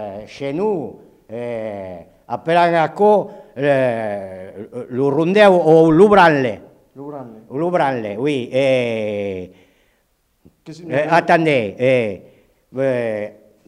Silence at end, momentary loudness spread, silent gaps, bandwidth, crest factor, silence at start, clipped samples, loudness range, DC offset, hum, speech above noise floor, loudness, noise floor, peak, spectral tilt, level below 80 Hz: 0.35 s; 21 LU; none; 11.5 kHz; 16 dB; 0 s; under 0.1%; 7 LU; under 0.1%; none; 47 dB; -16 LUFS; -64 dBFS; 0 dBFS; -7 dB/octave; -56 dBFS